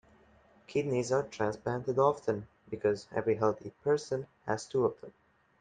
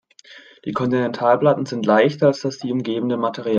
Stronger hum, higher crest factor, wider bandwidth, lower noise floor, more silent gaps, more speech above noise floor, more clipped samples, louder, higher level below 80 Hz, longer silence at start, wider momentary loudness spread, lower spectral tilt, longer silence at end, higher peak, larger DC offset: neither; about the same, 20 dB vs 18 dB; first, 9.4 kHz vs 7.6 kHz; first, -63 dBFS vs -46 dBFS; neither; first, 31 dB vs 27 dB; neither; second, -32 LUFS vs -19 LUFS; about the same, -68 dBFS vs -64 dBFS; first, 0.7 s vs 0.3 s; about the same, 9 LU vs 9 LU; about the same, -6 dB/octave vs -6.5 dB/octave; first, 0.5 s vs 0 s; second, -14 dBFS vs 0 dBFS; neither